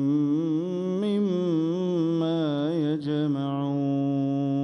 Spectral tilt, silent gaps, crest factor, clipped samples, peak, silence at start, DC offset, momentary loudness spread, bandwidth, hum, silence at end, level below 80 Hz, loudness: -9 dB/octave; none; 10 dB; under 0.1%; -16 dBFS; 0 s; under 0.1%; 2 LU; 6.6 kHz; none; 0 s; -72 dBFS; -26 LUFS